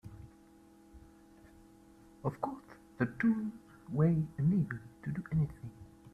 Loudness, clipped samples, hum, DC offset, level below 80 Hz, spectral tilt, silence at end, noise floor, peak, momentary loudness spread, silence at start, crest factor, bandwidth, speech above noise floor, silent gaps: -35 LUFS; under 0.1%; none; under 0.1%; -60 dBFS; -10 dB/octave; 0.05 s; -60 dBFS; -18 dBFS; 22 LU; 0.05 s; 20 dB; 5.8 kHz; 27 dB; none